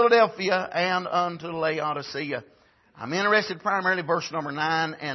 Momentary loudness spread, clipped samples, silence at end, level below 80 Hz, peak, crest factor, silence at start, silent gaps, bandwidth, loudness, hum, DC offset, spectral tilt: 9 LU; under 0.1%; 0 s; -72 dBFS; -6 dBFS; 18 dB; 0 s; none; 6.2 kHz; -25 LUFS; none; under 0.1%; -4.5 dB/octave